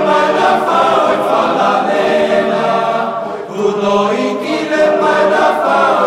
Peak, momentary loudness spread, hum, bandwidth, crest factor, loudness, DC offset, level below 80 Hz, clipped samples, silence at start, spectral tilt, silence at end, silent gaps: 0 dBFS; 6 LU; none; 13.5 kHz; 12 dB; -13 LUFS; under 0.1%; -54 dBFS; under 0.1%; 0 s; -5 dB/octave; 0 s; none